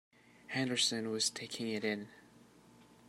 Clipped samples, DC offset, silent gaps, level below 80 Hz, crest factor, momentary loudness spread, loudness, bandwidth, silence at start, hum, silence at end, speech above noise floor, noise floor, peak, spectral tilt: under 0.1%; under 0.1%; none; -80 dBFS; 22 dB; 10 LU; -35 LUFS; 16 kHz; 0.5 s; none; 0.15 s; 25 dB; -62 dBFS; -18 dBFS; -2.5 dB/octave